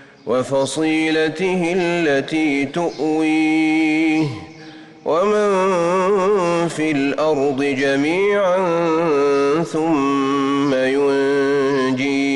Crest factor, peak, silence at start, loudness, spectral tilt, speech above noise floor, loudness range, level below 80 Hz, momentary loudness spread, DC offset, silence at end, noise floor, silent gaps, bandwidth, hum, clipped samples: 8 dB; -8 dBFS; 0 s; -18 LUFS; -5.5 dB/octave; 22 dB; 1 LU; -56 dBFS; 4 LU; under 0.1%; 0 s; -39 dBFS; none; 11.5 kHz; none; under 0.1%